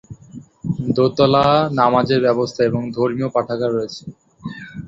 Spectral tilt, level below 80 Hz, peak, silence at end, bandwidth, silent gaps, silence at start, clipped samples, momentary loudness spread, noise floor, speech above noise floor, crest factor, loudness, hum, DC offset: -7 dB/octave; -50 dBFS; 0 dBFS; 0 s; 7.8 kHz; none; 0.1 s; under 0.1%; 19 LU; -40 dBFS; 23 dB; 18 dB; -17 LUFS; none; under 0.1%